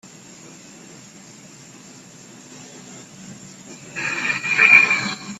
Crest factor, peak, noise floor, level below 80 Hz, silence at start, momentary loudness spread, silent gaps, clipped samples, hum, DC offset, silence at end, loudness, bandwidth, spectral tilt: 22 dB; 0 dBFS; -43 dBFS; -68 dBFS; 0.45 s; 29 LU; none; under 0.1%; none; under 0.1%; 0 s; -14 LUFS; 13.5 kHz; -2 dB/octave